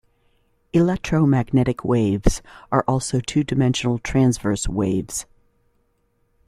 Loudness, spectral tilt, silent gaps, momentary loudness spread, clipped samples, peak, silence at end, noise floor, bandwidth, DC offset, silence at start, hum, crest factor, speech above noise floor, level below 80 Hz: -21 LUFS; -6 dB/octave; none; 5 LU; under 0.1%; -2 dBFS; 1.25 s; -66 dBFS; 14 kHz; under 0.1%; 0.75 s; none; 18 dB; 46 dB; -34 dBFS